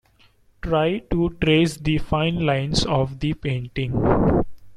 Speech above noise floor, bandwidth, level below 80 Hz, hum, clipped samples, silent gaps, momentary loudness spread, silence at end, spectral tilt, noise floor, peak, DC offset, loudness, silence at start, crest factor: 36 dB; 13 kHz; -36 dBFS; none; under 0.1%; none; 8 LU; 0 s; -6.5 dB/octave; -56 dBFS; -4 dBFS; under 0.1%; -22 LUFS; 0.65 s; 18 dB